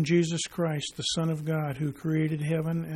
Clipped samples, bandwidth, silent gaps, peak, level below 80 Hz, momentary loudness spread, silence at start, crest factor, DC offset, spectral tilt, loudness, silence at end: under 0.1%; 14 kHz; none; -12 dBFS; -60 dBFS; 4 LU; 0 s; 16 dB; under 0.1%; -5.5 dB/octave; -29 LUFS; 0 s